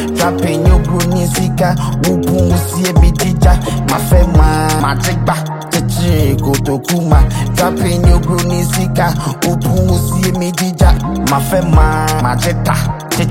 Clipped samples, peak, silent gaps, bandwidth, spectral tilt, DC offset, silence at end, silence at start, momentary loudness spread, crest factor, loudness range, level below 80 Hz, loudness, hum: under 0.1%; 0 dBFS; none; 17 kHz; -5.5 dB/octave; under 0.1%; 0 s; 0 s; 4 LU; 12 dB; 1 LU; -16 dBFS; -13 LUFS; none